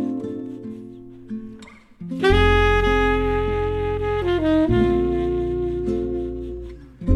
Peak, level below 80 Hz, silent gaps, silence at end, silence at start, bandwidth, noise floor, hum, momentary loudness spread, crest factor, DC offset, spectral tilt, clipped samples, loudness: -2 dBFS; -28 dBFS; none; 0 s; 0 s; 11 kHz; -43 dBFS; none; 18 LU; 18 dB; under 0.1%; -7.5 dB/octave; under 0.1%; -21 LUFS